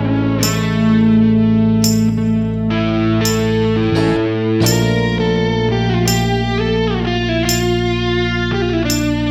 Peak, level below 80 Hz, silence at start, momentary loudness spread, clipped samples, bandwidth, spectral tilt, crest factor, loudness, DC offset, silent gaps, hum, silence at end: 0 dBFS; -30 dBFS; 0 s; 4 LU; under 0.1%; 16.5 kHz; -5.5 dB/octave; 14 dB; -15 LUFS; under 0.1%; none; none; 0 s